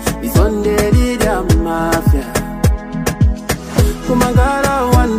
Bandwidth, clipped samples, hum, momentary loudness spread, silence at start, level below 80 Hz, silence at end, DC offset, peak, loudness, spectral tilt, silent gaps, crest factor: 16 kHz; under 0.1%; none; 5 LU; 0 s; -18 dBFS; 0 s; under 0.1%; 0 dBFS; -15 LUFS; -6 dB/octave; none; 14 dB